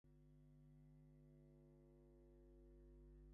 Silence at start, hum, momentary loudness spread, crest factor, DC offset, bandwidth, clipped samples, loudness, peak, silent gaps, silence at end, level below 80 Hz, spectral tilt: 0.05 s; 50 Hz at -70 dBFS; 2 LU; 10 dB; under 0.1%; 2.1 kHz; under 0.1%; -69 LUFS; -58 dBFS; none; 0 s; -70 dBFS; -10 dB/octave